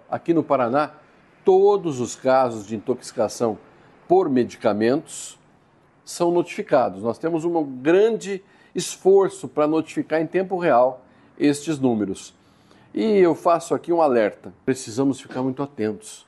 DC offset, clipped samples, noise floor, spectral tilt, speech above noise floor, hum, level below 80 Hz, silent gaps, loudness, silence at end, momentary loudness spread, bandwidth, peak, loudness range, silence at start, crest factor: under 0.1%; under 0.1%; -57 dBFS; -5.5 dB/octave; 36 dB; none; -66 dBFS; none; -21 LUFS; 0.1 s; 11 LU; 12.5 kHz; -4 dBFS; 3 LU; 0.1 s; 18 dB